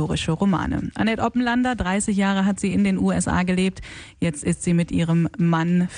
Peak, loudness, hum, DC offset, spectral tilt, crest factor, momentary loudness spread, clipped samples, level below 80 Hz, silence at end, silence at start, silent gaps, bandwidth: -6 dBFS; -22 LUFS; none; under 0.1%; -6 dB/octave; 14 dB; 5 LU; under 0.1%; -42 dBFS; 0 s; 0 s; none; 10.5 kHz